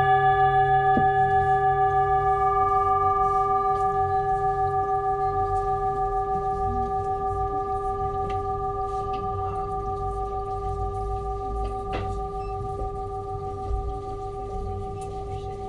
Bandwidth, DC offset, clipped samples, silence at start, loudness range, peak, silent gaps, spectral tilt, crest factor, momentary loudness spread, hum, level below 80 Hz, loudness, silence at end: 10.5 kHz; under 0.1%; under 0.1%; 0 s; 10 LU; -10 dBFS; none; -7.5 dB/octave; 14 dB; 12 LU; none; -38 dBFS; -25 LUFS; 0 s